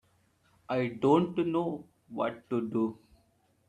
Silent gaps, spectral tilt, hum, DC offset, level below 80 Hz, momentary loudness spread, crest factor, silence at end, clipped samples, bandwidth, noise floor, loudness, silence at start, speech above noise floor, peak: none; -8 dB/octave; none; under 0.1%; -70 dBFS; 10 LU; 20 dB; 0.75 s; under 0.1%; 9 kHz; -69 dBFS; -31 LUFS; 0.7 s; 40 dB; -12 dBFS